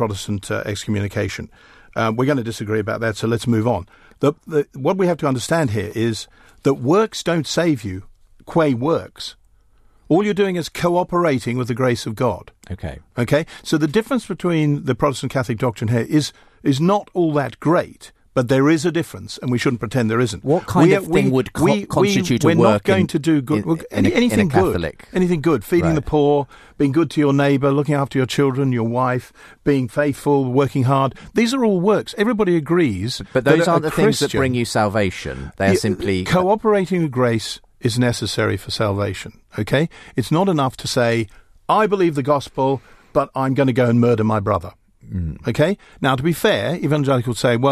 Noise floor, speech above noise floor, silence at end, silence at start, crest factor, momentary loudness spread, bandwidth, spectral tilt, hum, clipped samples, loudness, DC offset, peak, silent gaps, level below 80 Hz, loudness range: -52 dBFS; 34 dB; 0 s; 0 s; 18 dB; 8 LU; 14 kHz; -6 dB/octave; none; under 0.1%; -19 LUFS; under 0.1%; 0 dBFS; none; -44 dBFS; 4 LU